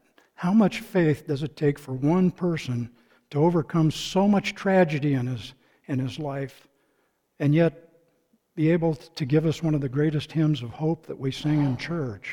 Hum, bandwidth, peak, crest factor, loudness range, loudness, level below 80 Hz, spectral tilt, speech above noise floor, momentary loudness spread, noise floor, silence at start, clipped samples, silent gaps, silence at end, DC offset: none; 16.5 kHz; -8 dBFS; 16 dB; 4 LU; -25 LUFS; -54 dBFS; -7.5 dB/octave; 46 dB; 10 LU; -70 dBFS; 0.4 s; under 0.1%; none; 0 s; under 0.1%